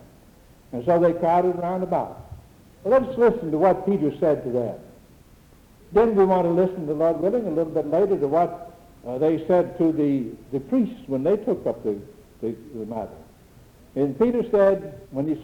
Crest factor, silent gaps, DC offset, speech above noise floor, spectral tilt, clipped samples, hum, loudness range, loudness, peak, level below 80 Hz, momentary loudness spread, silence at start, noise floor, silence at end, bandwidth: 16 dB; none; under 0.1%; 30 dB; -9 dB/octave; under 0.1%; none; 5 LU; -23 LUFS; -6 dBFS; -52 dBFS; 14 LU; 0.7 s; -51 dBFS; 0 s; 18 kHz